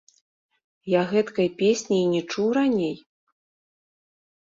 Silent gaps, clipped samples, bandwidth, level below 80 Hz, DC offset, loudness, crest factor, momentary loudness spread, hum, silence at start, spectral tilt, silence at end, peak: none; under 0.1%; 7.8 kHz; -68 dBFS; under 0.1%; -23 LUFS; 16 dB; 7 LU; none; 0.85 s; -5.5 dB/octave; 1.45 s; -8 dBFS